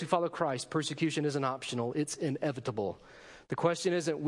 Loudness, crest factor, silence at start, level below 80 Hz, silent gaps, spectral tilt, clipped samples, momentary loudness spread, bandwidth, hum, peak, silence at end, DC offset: -33 LUFS; 18 dB; 0 s; -72 dBFS; none; -5 dB/octave; under 0.1%; 9 LU; 11.5 kHz; none; -14 dBFS; 0 s; under 0.1%